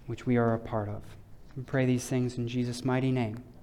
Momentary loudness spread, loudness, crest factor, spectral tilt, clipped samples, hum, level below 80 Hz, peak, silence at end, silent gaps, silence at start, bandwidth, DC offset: 11 LU; -30 LUFS; 14 dB; -7 dB/octave; under 0.1%; none; -54 dBFS; -16 dBFS; 0 s; none; 0 s; 13.5 kHz; under 0.1%